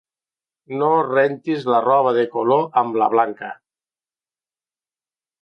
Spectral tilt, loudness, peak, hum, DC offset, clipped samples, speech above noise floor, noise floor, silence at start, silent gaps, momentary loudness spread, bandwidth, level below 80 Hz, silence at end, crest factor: -8 dB/octave; -18 LUFS; -4 dBFS; none; under 0.1%; under 0.1%; over 72 dB; under -90 dBFS; 0.7 s; none; 7 LU; 6.2 kHz; -76 dBFS; 1.9 s; 18 dB